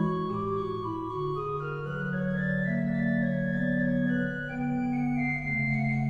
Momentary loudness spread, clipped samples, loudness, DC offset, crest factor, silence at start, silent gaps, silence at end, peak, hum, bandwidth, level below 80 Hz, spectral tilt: 6 LU; under 0.1%; -29 LUFS; under 0.1%; 12 dB; 0 s; none; 0 s; -16 dBFS; none; 7 kHz; -50 dBFS; -9.5 dB/octave